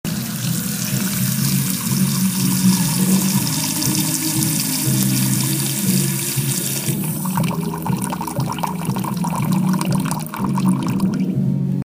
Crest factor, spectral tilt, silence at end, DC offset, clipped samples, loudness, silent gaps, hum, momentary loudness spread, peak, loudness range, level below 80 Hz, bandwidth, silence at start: 18 dB; -4.5 dB/octave; 0 s; under 0.1%; under 0.1%; -19 LUFS; none; none; 6 LU; 0 dBFS; 4 LU; -50 dBFS; 16 kHz; 0.05 s